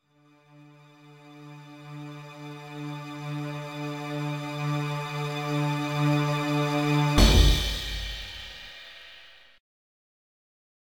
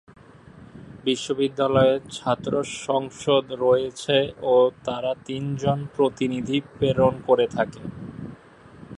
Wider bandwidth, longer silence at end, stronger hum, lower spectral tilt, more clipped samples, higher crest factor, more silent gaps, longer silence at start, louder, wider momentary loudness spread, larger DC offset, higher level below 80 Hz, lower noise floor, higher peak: first, 19.5 kHz vs 11 kHz; first, 1.7 s vs 0.05 s; neither; about the same, -5 dB/octave vs -5.5 dB/octave; neither; about the same, 22 dB vs 18 dB; neither; first, 1.05 s vs 0.55 s; second, -27 LUFS vs -23 LUFS; first, 23 LU vs 10 LU; neither; first, -34 dBFS vs -54 dBFS; first, -61 dBFS vs -47 dBFS; about the same, -6 dBFS vs -4 dBFS